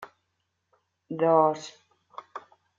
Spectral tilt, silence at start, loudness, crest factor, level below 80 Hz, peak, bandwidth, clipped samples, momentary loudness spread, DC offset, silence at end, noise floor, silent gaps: -6.5 dB/octave; 0 s; -23 LUFS; 20 dB; -80 dBFS; -8 dBFS; 7.6 kHz; under 0.1%; 25 LU; under 0.1%; 0.4 s; -78 dBFS; none